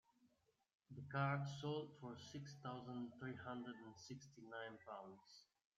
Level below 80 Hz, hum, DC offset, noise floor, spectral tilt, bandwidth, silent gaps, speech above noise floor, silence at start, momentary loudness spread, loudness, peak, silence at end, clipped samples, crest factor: -84 dBFS; none; under 0.1%; -82 dBFS; -6 dB/octave; 7.6 kHz; 0.75-0.80 s; 32 dB; 0.2 s; 16 LU; -50 LUFS; -30 dBFS; 0.35 s; under 0.1%; 20 dB